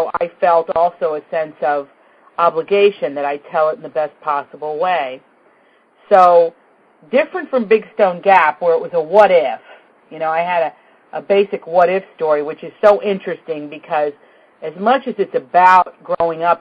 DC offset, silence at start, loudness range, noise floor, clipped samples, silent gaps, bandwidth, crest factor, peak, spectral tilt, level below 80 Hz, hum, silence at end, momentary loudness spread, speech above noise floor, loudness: under 0.1%; 0 s; 4 LU; -53 dBFS; under 0.1%; none; 7.4 kHz; 16 dB; 0 dBFS; -6.5 dB/octave; -62 dBFS; none; 0.05 s; 13 LU; 38 dB; -16 LUFS